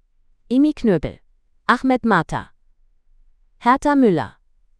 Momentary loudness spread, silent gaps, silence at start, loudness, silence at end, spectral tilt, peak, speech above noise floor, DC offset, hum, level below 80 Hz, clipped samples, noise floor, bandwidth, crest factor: 13 LU; none; 0.5 s; -19 LUFS; 0.5 s; -7 dB/octave; 0 dBFS; 39 dB; under 0.1%; none; -44 dBFS; under 0.1%; -56 dBFS; 11 kHz; 20 dB